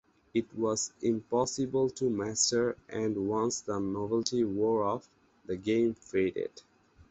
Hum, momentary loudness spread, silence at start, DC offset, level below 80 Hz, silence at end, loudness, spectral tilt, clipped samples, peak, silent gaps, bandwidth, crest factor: none; 7 LU; 0.35 s; under 0.1%; -64 dBFS; 0.5 s; -31 LUFS; -4 dB/octave; under 0.1%; -12 dBFS; none; 8.4 kHz; 20 dB